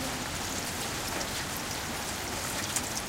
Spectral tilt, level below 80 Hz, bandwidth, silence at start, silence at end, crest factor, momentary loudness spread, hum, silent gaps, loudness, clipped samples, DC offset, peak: -2 dB/octave; -50 dBFS; 16.5 kHz; 0 s; 0 s; 20 dB; 3 LU; none; none; -32 LUFS; under 0.1%; under 0.1%; -14 dBFS